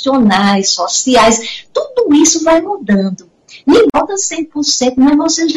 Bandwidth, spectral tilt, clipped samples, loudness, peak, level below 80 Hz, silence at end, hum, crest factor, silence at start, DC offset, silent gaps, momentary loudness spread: 12 kHz; -3.5 dB/octave; under 0.1%; -11 LUFS; 0 dBFS; -44 dBFS; 0 s; none; 12 dB; 0 s; under 0.1%; none; 9 LU